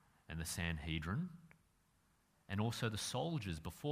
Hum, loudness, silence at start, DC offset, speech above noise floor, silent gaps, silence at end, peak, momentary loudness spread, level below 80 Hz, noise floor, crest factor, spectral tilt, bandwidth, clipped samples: none; -42 LUFS; 0.3 s; under 0.1%; 34 dB; none; 0 s; -24 dBFS; 8 LU; -58 dBFS; -76 dBFS; 20 dB; -4.5 dB/octave; 15.5 kHz; under 0.1%